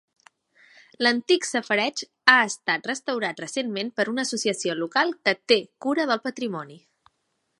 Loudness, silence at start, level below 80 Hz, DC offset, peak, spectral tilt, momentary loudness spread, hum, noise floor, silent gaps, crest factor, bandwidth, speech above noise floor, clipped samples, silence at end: -23 LUFS; 1 s; -78 dBFS; under 0.1%; 0 dBFS; -2.5 dB/octave; 10 LU; none; -75 dBFS; none; 24 dB; 11.5 kHz; 50 dB; under 0.1%; 0.8 s